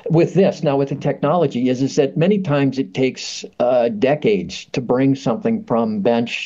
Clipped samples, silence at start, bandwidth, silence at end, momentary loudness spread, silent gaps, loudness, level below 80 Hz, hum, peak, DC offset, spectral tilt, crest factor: under 0.1%; 0.05 s; 7.8 kHz; 0 s; 5 LU; none; -18 LUFS; -58 dBFS; none; -4 dBFS; under 0.1%; -6.5 dB/octave; 14 dB